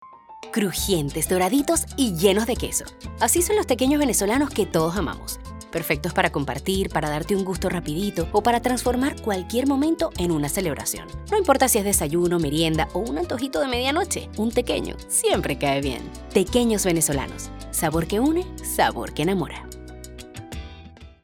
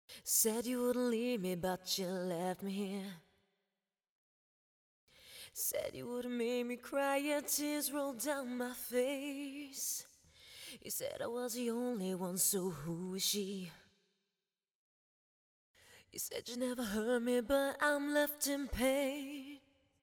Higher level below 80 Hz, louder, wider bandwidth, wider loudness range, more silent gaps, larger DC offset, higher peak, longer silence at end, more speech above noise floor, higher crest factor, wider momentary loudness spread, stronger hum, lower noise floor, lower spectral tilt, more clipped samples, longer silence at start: first, -38 dBFS vs -64 dBFS; first, -23 LUFS vs -37 LUFS; about the same, 19 kHz vs over 20 kHz; second, 3 LU vs 9 LU; second, none vs 4.09-5.07 s, 14.75-15.74 s; neither; first, -4 dBFS vs -20 dBFS; second, 0.15 s vs 0.45 s; second, 21 dB vs over 52 dB; about the same, 20 dB vs 20 dB; about the same, 12 LU vs 13 LU; neither; second, -44 dBFS vs under -90 dBFS; about the same, -4 dB/octave vs -3 dB/octave; neither; about the same, 0 s vs 0.1 s